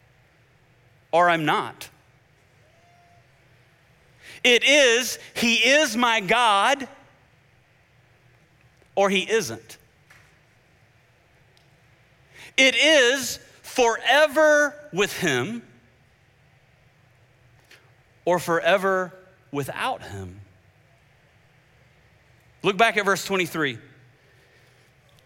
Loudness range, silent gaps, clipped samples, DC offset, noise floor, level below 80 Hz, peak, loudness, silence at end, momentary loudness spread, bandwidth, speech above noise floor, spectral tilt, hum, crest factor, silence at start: 11 LU; none; under 0.1%; under 0.1%; -59 dBFS; -64 dBFS; -4 dBFS; -20 LUFS; 1.45 s; 18 LU; 17 kHz; 38 dB; -2.5 dB/octave; none; 20 dB; 1.15 s